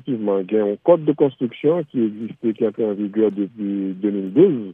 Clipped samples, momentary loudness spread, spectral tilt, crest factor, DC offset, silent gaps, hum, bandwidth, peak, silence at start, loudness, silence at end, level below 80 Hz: under 0.1%; 8 LU; -11 dB/octave; 16 dB; under 0.1%; none; none; 3.7 kHz; -2 dBFS; 0.05 s; -20 LUFS; 0 s; -76 dBFS